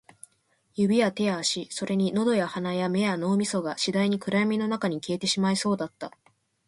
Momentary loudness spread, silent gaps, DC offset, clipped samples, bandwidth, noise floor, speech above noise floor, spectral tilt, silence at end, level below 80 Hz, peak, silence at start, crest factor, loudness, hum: 6 LU; none; under 0.1%; under 0.1%; 11.5 kHz; -69 dBFS; 43 dB; -5 dB/octave; 0.6 s; -68 dBFS; -12 dBFS; 0.75 s; 16 dB; -26 LUFS; none